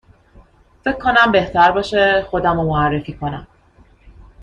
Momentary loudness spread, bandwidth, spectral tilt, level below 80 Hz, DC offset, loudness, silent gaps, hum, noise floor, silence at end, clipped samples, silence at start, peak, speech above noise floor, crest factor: 13 LU; 9.8 kHz; -6.5 dB/octave; -40 dBFS; under 0.1%; -16 LUFS; none; none; -50 dBFS; 0 s; under 0.1%; 0.85 s; -2 dBFS; 35 dB; 16 dB